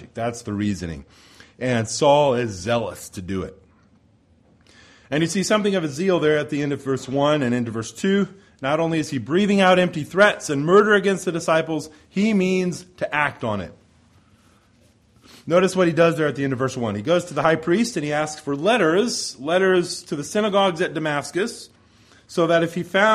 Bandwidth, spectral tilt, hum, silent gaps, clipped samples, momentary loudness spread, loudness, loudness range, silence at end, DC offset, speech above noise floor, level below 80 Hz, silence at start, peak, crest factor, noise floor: 14.5 kHz; -5 dB/octave; none; none; under 0.1%; 12 LU; -21 LUFS; 6 LU; 0 s; under 0.1%; 37 dB; -56 dBFS; 0 s; -2 dBFS; 20 dB; -57 dBFS